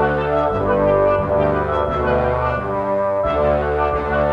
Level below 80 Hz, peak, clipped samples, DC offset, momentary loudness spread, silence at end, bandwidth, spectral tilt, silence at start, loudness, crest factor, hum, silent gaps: -32 dBFS; -6 dBFS; under 0.1%; under 0.1%; 4 LU; 0 s; 5.6 kHz; -8.5 dB/octave; 0 s; -18 LUFS; 12 dB; none; none